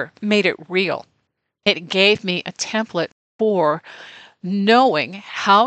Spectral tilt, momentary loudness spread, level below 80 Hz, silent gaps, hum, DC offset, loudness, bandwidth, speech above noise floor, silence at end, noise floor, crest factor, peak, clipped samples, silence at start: -4 dB/octave; 13 LU; -70 dBFS; 3.12-3.39 s; none; under 0.1%; -19 LUFS; 8.8 kHz; 53 dB; 0 s; -72 dBFS; 18 dB; -2 dBFS; under 0.1%; 0 s